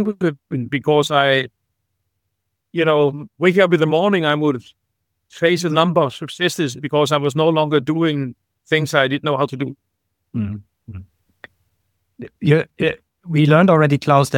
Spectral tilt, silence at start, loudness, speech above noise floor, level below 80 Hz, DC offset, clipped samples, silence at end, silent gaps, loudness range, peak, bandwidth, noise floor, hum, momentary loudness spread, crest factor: -6 dB/octave; 0 s; -17 LUFS; 58 dB; -58 dBFS; under 0.1%; under 0.1%; 0 s; none; 6 LU; 0 dBFS; 16.5 kHz; -75 dBFS; none; 14 LU; 18 dB